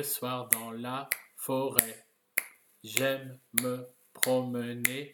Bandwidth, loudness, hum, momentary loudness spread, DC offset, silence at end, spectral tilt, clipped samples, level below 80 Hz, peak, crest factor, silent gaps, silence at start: 19 kHz; -31 LUFS; none; 12 LU; under 0.1%; 0 s; -2.5 dB/octave; under 0.1%; -70 dBFS; 0 dBFS; 32 dB; none; 0 s